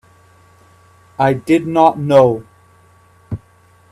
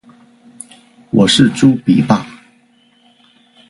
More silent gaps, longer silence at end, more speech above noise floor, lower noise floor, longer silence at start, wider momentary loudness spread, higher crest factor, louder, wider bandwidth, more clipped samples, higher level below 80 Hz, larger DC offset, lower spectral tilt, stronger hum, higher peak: neither; second, 0.55 s vs 1.35 s; second, 37 dB vs 41 dB; about the same, -50 dBFS vs -52 dBFS; about the same, 1.2 s vs 1.15 s; second, 19 LU vs 25 LU; about the same, 18 dB vs 16 dB; about the same, -14 LUFS vs -12 LUFS; first, 13 kHz vs 11.5 kHz; neither; about the same, -52 dBFS vs -50 dBFS; neither; first, -7.5 dB/octave vs -5 dB/octave; first, 60 Hz at -50 dBFS vs none; about the same, 0 dBFS vs 0 dBFS